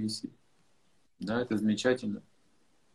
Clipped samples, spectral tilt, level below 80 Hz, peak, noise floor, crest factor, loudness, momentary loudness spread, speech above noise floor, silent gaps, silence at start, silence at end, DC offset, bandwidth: under 0.1%; -5 dB/octave; -70 dBFS; -14 dBFS; -73 dBFS; 20 dB; -32 LUFS; 15 LU; 41 dB; none; 0 s; 0.75 s; under 0.1%; 12.5 kHz